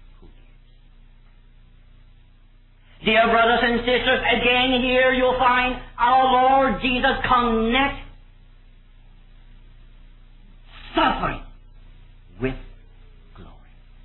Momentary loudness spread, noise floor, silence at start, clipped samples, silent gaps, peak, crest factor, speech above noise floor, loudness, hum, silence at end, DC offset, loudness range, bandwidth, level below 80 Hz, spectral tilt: 12 LU; -51 dBFS; 3 s; under 0.1%; none; -6 dBFS; 16 dB; 32 dB; -19 LUFS; 60 Hz at -50 dBFS; 0.55 s; under 0.1%; 11 LU; 4.3 kHz; -40 dBFS; -8 dB/octave